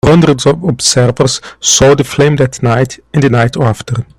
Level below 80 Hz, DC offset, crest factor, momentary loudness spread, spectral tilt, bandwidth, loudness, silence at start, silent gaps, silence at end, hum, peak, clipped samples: -34 dBFS; under 0.1%; 10 dB; 7 LU; -4.5 dB/octave; 15 kHz; -10 LUFS; 0.05 s; none; 0.15 s; none; 0 dBFS; under 0.1%